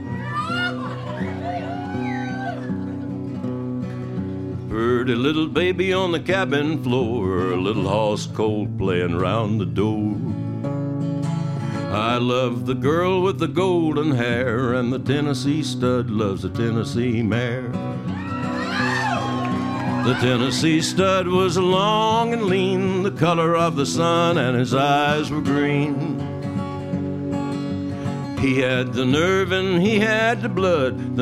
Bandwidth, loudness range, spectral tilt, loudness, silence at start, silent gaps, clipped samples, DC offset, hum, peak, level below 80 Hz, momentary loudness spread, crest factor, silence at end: 14 kHz; 5 LU; -6 dB/octave; -21 LUFS; 0 s; none; under 0.1%; under 0.1%; none; -4 dBFS; -52 dBFS; 9 LU; 18 dB; 0 s